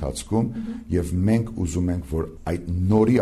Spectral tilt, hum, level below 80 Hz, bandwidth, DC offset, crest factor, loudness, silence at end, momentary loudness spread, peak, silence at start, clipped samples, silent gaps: -7.5 dB/octave; none; -38 dBFS; 13.5 kHz; under 0.1%; 14 dB; -24 LUFS; 0 s; 9 LU; -8 dBFS; 0 s; under 0.1%; none